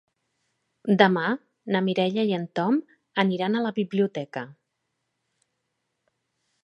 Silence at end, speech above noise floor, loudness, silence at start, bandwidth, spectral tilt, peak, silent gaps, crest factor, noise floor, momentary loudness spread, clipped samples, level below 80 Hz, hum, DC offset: 2.15 s; 55 dB; -25 LUFS; 0.85 s; 6.8 kHz; -7.5 dB/octave; -2 dBFS; none; 24 dB; -79 dBFS; 13 LU; under 0.1%; -76 dBFS; none; under 0.1%